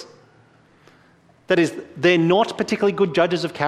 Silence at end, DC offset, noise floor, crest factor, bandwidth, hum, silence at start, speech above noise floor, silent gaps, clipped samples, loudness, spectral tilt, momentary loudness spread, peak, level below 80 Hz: 0 s; under 0.1%; -55 dBFS; 18 dB; 12 kHz; none; 0 s; 36 dB; none; under 0.1%; -19 LUFS; -5.5 dB/octave; 5 LU; -2 dBFS; -62 dBFS